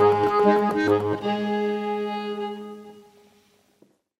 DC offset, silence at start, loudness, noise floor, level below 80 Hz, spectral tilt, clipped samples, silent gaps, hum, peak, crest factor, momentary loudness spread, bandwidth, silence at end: under 0.1%; 0 s; -23 LUFS; -62 dBFS; -66 dBFS; -7 dB/octave; under 0.1%; none; none; -6 dBFS; 18 dB; 15 LU; 12 kHz; 1.2 s